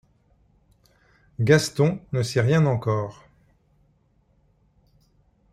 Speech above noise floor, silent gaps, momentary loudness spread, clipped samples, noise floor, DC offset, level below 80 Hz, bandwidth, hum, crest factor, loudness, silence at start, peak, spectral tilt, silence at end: 42 dB; none; 9 LU; under 0.1%; -64 dBFS; under 0.1%; -56 dBFS; 14 kHz; none; 24 dB; -22 LUFS; 1.4 s; -2 dBFS; -6 dB/octave; 2.4 s